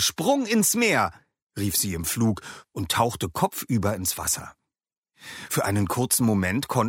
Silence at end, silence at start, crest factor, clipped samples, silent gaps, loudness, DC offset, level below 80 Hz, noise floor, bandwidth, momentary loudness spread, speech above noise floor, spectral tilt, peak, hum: 0 s; 0 s; 18 dB; under 0.1%; 1.42-1.50 s, 4.98-5.02 s; -24 LUFS; under 0.1%; -52 dBFS; -88 dBFS; 17 kHz; 13 LU; 64 dB; -4 dB/octave; -6 dBFS; none